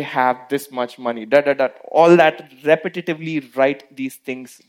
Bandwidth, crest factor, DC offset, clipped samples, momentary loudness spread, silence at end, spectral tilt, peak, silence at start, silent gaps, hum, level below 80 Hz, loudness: 16.5 kHz; 18 dB; under 0.1%; under 0.1%; 15 LU; 0.25 s; -6 dB/octave; 0 dBFS; 0 s; none; none; -72 dBFS; -18 LUFS